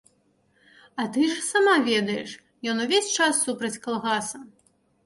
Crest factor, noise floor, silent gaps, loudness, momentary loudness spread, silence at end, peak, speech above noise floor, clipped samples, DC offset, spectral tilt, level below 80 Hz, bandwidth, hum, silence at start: 18 dB; -66 dBFS; none; -24 LUFS; 14 LU; 0.6 s; -8 dBFS; 42 dB; under 0.1%; under 0.1%; -2.5 dB/octave; -72 dBFS; 11.5 kHz; none; 0.95 s